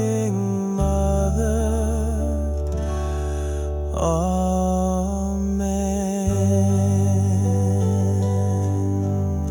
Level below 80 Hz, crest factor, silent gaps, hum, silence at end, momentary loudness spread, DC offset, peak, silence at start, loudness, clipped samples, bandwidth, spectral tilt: -28 dBFS; 12 dB; none; none; 0 s; 6 LU; under 0.1%; -8 dBFS; 0 s; -22 LUFS; under 0.1%; 18 kHz; -7.5 dB/octave